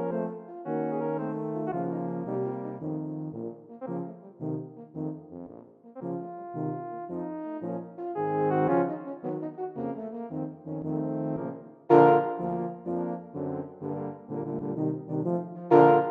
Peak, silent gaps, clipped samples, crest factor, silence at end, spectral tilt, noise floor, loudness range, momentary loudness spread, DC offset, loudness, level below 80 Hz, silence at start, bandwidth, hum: -6 dBFS; none; under 0.1%; 24 dB; 0 s; -10.5 dB/octave; -49 dBFS; 11 LU; 16 LU; under 0.1%; -30 LUFS; -72 dBFS; 0 s; 4.8 kHz; none